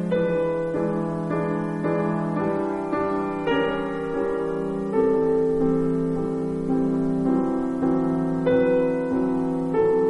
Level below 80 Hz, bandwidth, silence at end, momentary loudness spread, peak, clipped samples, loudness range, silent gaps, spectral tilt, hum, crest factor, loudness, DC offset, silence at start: -48 dBFS; 10.5 kHz; 0 s; 5 LU; -10 dBFS; under 0.1%; 2 LU; none; -8.5 dB/octave; none; 12 dB; -24 LUFS; under 0.1%; 0 s